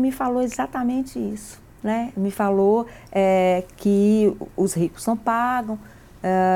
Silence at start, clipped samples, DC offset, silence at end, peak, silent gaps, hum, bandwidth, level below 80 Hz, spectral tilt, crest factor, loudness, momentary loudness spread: 0 s; under 0.1%; under 0.1%; 0 s; -8 dBFS; none; none; 17 kHz; -50 dBFS; -6.5 dB/octave; 14 dB; -22 LUFS; 12 LU